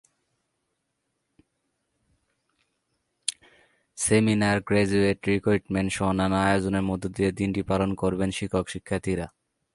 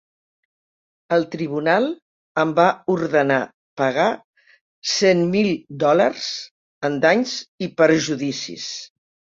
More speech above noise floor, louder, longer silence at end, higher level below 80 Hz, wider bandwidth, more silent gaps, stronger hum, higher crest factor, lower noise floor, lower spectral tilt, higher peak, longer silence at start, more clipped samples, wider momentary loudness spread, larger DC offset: second, 54 dB vs over 71 dB; second, -25 LUFS vs -20 LUFS; about the same, 0.45 s vs 0.5 s; first, -48 dBFS vs -64 dBFS; first, 11.5 kHz vs 7.8 kHz; second, none vs 2.02-2.35 s, 3.54-3.77 s, 4.24-4.33 s, 4.61-4.82 s, 6.51-6.81 s, 7.48-7.58 s; neither; about the same, 20 dB vs 20 dB; second, -78 dBFS vs under -90 dBFS; about the same, -5.5 dB/octave vs -4.5 dB/octave; second, -6 dBFS vs -2 dBFS; first, 3.3 s vs 1.1 s; neither; second, 9 LU vs 13 LU; neither